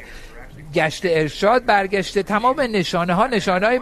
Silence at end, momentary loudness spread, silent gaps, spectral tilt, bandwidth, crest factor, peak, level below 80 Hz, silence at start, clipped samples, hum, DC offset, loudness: 0 s; 4 LU; none; -5 dB/octave; 13 kHz; 16 dB; -2 dBFS; -42 dBFS; 0 s; under 0.1%; none; under 0.1%; -19 LUFS